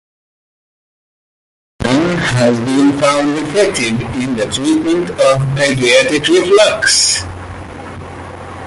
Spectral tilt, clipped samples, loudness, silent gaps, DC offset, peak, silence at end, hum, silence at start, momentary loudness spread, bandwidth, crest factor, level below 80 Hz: -4 dB/octave; under 0.1%; -12 LUFS; none; under 0.1%; 0 dBFS; 0 s; none; 1.8 s; 19 LU; 11.5 kHz; 14 dB; -40 dBFS